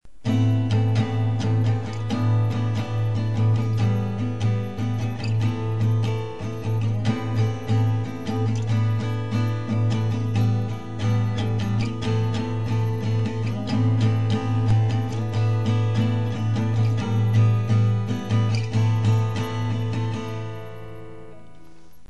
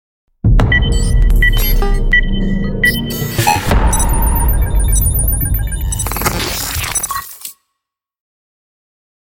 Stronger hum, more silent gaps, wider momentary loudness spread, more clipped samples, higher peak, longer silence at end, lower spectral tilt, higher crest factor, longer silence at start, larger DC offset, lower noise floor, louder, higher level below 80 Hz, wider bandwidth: neither; neither; about the same, 6 LU vs 6 LU; neither; second, -8 dBFS vs 0 dBFS; second, 0 s vs 1.7 s; first, -7.5 dB/octave vs -4 dB/octave; about the same, 14 dB vs 12 dB; second, 0 s vs 0.45 s; first, 1% vs under 0.1%; second, -50 dBFS vs -77 dBFS; second, -23 LUFS vs -15 LUFS; second, -50 dBFS vs -16 dBFS; second, 12 kHz vs 17 kHz